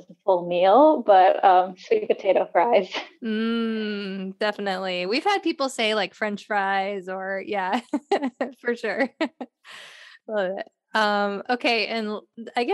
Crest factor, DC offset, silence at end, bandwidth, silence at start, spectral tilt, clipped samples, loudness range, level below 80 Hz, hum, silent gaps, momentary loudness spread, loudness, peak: 18 dB; under 0.1%; 0 s; 12 kHz; 0.1 s; -4.5 dB/octave; under 0.1%; 8 LU; -80 dBFS; none; none; 14 LU; -23 LUFS; -4 dBFS